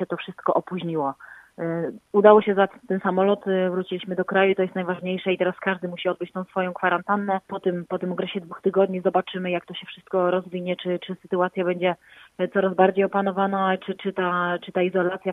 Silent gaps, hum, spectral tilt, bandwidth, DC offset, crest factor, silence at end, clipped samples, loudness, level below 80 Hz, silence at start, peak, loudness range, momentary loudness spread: none; none; -8.5 dB/octave; 3.9 kHz; under 0.1%; 22 dB; 0 s; under 0.1%; -24 LUFS; -70 dBFS; 0 s; -2 dBFS; 5 LU; 10 LU